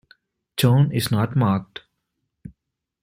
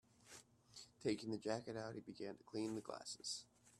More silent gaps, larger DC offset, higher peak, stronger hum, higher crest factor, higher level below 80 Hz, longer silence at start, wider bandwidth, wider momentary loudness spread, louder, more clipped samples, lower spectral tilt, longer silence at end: neither; neither; first, -4 dBFS vs -28 dBFS; neither; about the same, 18 dB vs 20 dB; first, -56 dBFS vs -82 dBFS; first, 0.55 s vs 0.2 s; first, 16 kHz vs 13 kHz; about the same, 19 LU vs 17 LU; first, -21 LUFS vs -47 LUFS; neither; first, -6.5 dB/octave vs -4 dB/octave; first, 0.55 s vs 0 s